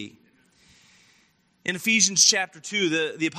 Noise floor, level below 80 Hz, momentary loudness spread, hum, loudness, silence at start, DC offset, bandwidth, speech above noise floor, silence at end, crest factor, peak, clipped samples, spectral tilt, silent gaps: -64 dBFS; -76 dBFS; 15 LU; none; -21 LUFS; 0 s; under 0.1%; 15.5 kHz; 41 dB; 0 s; 22 dB; -2 dBFS; under 0.1%; -1 dB/octave; none